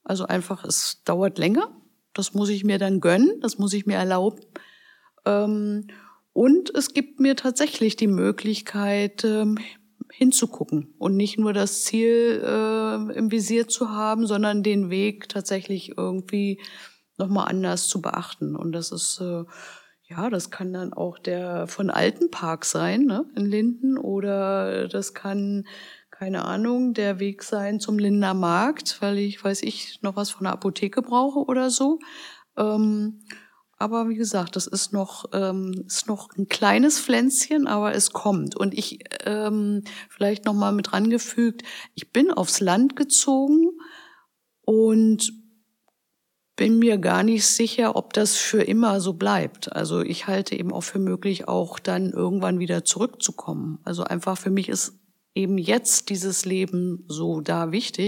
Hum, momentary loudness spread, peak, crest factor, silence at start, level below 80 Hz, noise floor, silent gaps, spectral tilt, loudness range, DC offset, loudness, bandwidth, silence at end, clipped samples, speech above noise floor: none; 11 LU; -4 dBFS; 18 dB; 0.1 s; -80 dBFS; -77 dBFS; none; -4 dB/octave; 6 LU; under 0.1%; -23 LUFS; 17 kHz; 0 s; under 0.1%; 54 dB